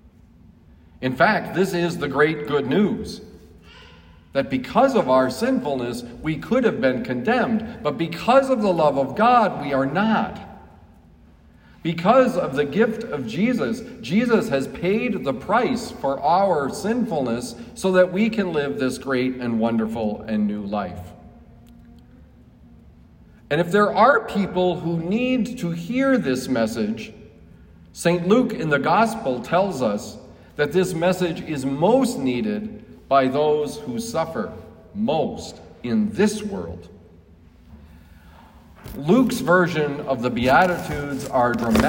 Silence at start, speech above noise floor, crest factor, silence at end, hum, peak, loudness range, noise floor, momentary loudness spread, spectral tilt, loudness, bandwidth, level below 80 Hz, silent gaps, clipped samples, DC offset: 1 s; 29 dB; 18 dB; 0 s; none; -4 dBFS; 6 LU; -50 dBFS; 12 LU; -6 dB/octave; -21 LUFS; 16.5 kHz; -50 dBFS; none; under 0.1%; under 0.1%